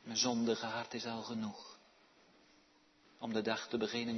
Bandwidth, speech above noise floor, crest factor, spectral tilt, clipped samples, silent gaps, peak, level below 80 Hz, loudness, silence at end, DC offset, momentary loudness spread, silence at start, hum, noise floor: 6.2 kHz; 31 dB; 20 dB; -3 dB/octave; under 0.1%; none; -20 dBFS; -80 dBFS; -38 LUFS; 0 s; under 0.1%; 13 LU; 0.05 s; none; -69 dBFS